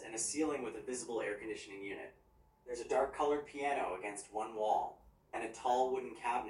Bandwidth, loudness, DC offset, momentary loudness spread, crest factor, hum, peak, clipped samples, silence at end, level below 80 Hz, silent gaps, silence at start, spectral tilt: 12 kHz; -38 LUFS; under 0.1%; 12 LU; 18 dB; none; -22 dBFS; under 0.1%; 0 s; -70 dBFS; none; 0 s; -3 dB/octave